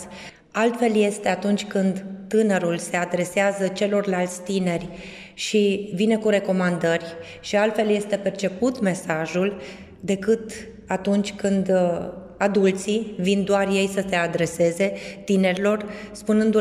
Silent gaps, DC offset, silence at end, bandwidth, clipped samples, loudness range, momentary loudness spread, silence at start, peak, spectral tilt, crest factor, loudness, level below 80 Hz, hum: none; under 0.1%; 0 s; 13.5 kHz; under 0.1%; 2 LU; 11 LU; 0 s; -6 dBFS; -5.5 dB/octave; 16 dB; -23 LUFS; -56 dBFS; none